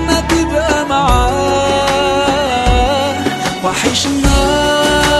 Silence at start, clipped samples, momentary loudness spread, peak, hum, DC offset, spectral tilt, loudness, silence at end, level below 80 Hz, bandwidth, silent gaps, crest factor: 0 s; under 0.1%; 3 LU; 0 dBFS; none; under 0.1%; -4 dB/octave; -13 LUFS; 0 s; -22 dBFS; 13 kHz; none; 12 dB